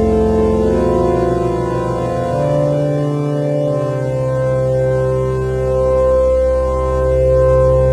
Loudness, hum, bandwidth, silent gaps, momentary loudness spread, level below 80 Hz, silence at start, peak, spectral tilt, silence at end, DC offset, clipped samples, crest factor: -15 LUFS; none; 11 kHz; none; 6 LU; -24 dBFS; 0 s; -4 dBFS; -8.5 dB/octave; 0 s; under 0.1%; under 0.1%; 10 dB